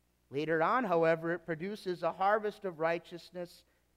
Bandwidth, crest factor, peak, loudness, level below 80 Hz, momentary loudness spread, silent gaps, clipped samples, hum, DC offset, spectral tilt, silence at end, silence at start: 14.5 kHz; 18 dB; -16 dBFS; -33 LUFS; -74 dBFS; 16 LU; none; under 0.1%; none; under 0.1%; -6.5 dB/octave; 0.5 s; 0.3 s